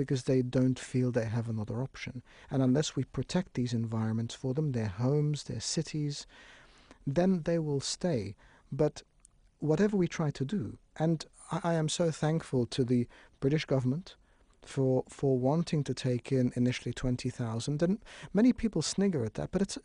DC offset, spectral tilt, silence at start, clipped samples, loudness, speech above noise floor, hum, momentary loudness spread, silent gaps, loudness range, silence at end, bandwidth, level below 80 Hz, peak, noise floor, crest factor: under 0.1%; -6 dB/octave; 0 s; under 0.1%; -32 LUFS; 33 dB; none; 9 LU; none; 2 LU; 0.05 s; 10.5 kHz; -56 dBFS; -14 dBFS; -63 dBFS; 16 dB